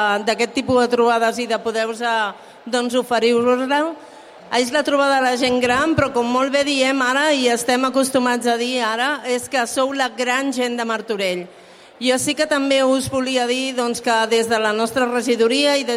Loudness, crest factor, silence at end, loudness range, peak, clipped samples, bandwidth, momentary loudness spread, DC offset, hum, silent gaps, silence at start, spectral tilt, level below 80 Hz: -18 LUFS; 14 dB; 0 s; 3 LU; -4 dBFS; under 0.1%; 16 kHz; 6 LU; under 0.1%; none; none; 0 s; -3 dB/octave; -54 dBFS